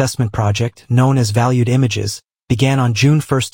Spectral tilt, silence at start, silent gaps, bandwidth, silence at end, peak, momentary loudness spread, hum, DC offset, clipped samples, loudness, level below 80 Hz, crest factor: -6 dB/octave; 0 s; none; 17 kHz; 0.05 s; 0 dBFS; 8 LU; none; under 0.1%; under 0.1%; -15 LUFS; -44 dBFS; 14 dB